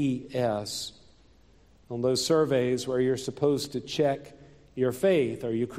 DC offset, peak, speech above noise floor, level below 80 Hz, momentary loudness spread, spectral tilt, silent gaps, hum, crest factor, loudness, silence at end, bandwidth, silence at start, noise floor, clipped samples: under 0.1%; -12 dBFS; 32 dB; -60 dBFS; 11 LU; -5 dB/octave; none; none; 16 dB; -27 LUFS; 0 s; 16 kHz; 0 s; -59 dBFS; under 0.1%